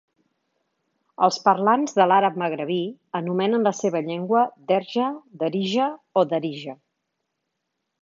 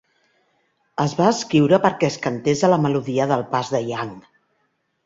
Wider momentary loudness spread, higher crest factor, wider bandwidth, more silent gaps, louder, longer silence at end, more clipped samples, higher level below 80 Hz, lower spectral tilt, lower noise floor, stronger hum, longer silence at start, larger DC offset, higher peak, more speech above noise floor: about the same, 10 LU vs 10 LU; about the same, 22 dB vs 20 dB; about the same, 7.6 kHz vs 7.8 kHz; neither; about the same, -22 LUFS vs -20 LUFS; first, 1.3 s vs 0.85 s; neither; second, -78 dBFS vs -60 dBFS; about the same, -5.5 dB/octave vs -6 dB/octave; first, -79 dBFS vs -69 dBFS; neither; first, 1.2 s vs 1 s; neither; about the same, -2 dBFS vs -2 dBFS; first, 57 dB vs 50 dB